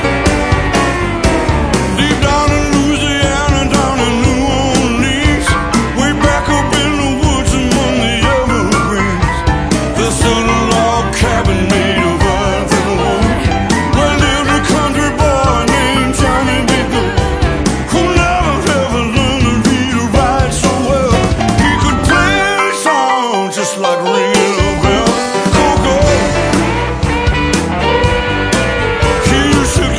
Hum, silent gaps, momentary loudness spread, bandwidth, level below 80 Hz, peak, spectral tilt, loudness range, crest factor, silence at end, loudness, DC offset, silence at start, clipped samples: none; none; 3 LU; 11 kHz; -20 dBFS; 0 dBFS; -4.5 dB/octave; 1 LU; 12 dB; 0 s; -12 LUFS; under 0.1%; 0 s; under 0.1%